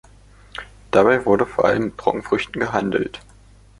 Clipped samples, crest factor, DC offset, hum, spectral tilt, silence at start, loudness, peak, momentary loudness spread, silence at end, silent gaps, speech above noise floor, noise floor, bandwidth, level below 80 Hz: under 0.1%; 20 dB; under 0.1%; 50 Hz at -40 dBFS; -6 dB/octave; 0.55 s; -19 LUFS; 0 dBFS; 20 LU; 0.6 s; none; 29 dB; -48 dBFS; 11.5 kHz; -48 dBFS